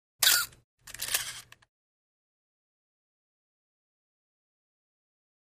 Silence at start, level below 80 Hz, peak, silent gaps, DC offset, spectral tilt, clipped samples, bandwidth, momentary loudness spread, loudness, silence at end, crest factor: 0.2 s; -70 dBFS; -8 dBFS; 0.64-0.77 s; under 0.1%; 2.5 dB/octave; under 0.1%; 15.5 kHz; 21 LU; -27 LUFS; 4.15 s; 28 dB